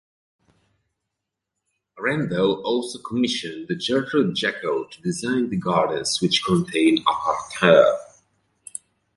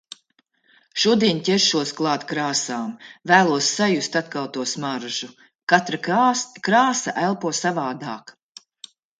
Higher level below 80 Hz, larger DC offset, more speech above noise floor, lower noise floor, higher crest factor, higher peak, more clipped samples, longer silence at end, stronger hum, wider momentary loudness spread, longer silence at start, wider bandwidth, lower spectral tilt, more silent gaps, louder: first, -60 dBFS vs -68 dBFS; neither; first, 61 dB vs 44 dB; first, -83 dBFS vs -66 dBFS; about the same, 22 dB vs 22 dB; about the same, -2 dBFS vs 0 dBFS; neither; first, 1.1 s vs 0.9 s; neither; about the same, 12 LU vs 14 LU; first, 1.95 s vs 0.95 s; first, 11.5 kHz vs 9.6 kHz; first, -4.5 dB/octave vs -3 dB/octave; second, none vs 5.55-5.67 s; about the same, -21 LUFS vs -21 LUFS